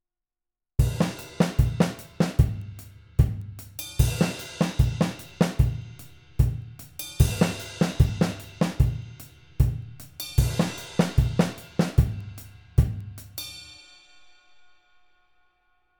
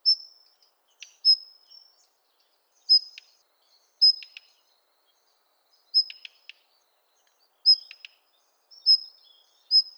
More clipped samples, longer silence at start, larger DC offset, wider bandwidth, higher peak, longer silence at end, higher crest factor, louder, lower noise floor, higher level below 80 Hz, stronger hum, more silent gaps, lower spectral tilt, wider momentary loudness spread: neither; first, 0.8 s vs 0.05 s; neither; about the same, over 20 kHz vs over 20 kHz; first, -4 dBFS vs -10 dBFS; first, 2.25 s vs 0.15 s; about the same, 22 dB vs 18 dB; second, -26 LUFS vs -21 LUFS; first, -87 dBFS vs -69 dBFS; first, -32 dBFS vs under -90 dBFS; neither; neither; first, -6.5 dB/octave vs 6.5 dB/octave; second, 16 LU vs 25 LU